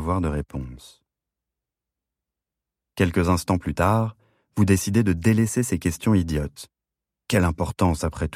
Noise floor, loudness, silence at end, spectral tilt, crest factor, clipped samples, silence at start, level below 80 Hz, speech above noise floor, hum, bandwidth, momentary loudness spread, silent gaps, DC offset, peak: -87 dBFS; -23 LUFS; 0 s; -6 dB/octave; 18 dB; under 0.1%; 0 s; -40 dBFS; 65 dB; none; 16 kHz; 13 LU; none; under 0.1%; -6 dBFS